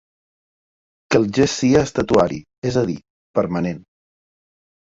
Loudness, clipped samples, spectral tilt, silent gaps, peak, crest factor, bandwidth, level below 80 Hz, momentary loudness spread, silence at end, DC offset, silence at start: -19 LUFS; under 0.1%; -5.5 dB/octave; 2.58-2.62 s, 3.10-3.34 s; -2 dBFS; 20 dB; 7.8 kHz; -46 dBFS; 10 LU; 1.15 s; under 0.1%; 1.1 s